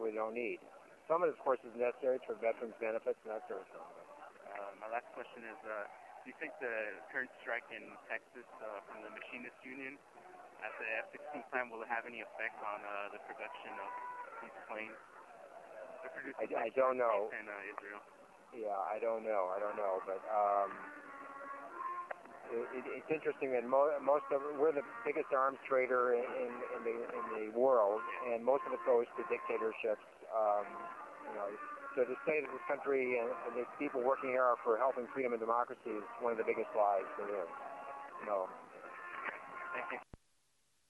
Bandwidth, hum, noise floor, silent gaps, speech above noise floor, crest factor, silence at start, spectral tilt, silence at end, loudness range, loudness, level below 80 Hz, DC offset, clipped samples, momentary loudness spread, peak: 11.5 kHz; none; -78 dBFS; none; 40 dB; 20 dB; 0 s; -6 dB/octave; 0.75 s; 10 LU; -38 LUFS; -84 dBFS; under 0.1%; under 0.1%; 16 LU; -20 dBFS